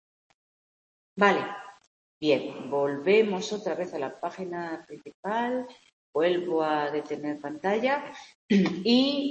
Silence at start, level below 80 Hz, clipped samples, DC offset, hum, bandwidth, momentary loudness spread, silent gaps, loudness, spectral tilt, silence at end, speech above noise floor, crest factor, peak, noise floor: 1.15 s; -74 dBFS; under 0.1%; under 0.1%; none; 8.4 kHz; 14 LU; 1.87-2.21 s, 5.14-5.23 s, 5.93-6.13 s, 8.35-8.49 s; -27 LUFS; -5.5 dB/octave; 0 s; over 63 dB; 22 dB; -6 dBFS; under -90 dBFS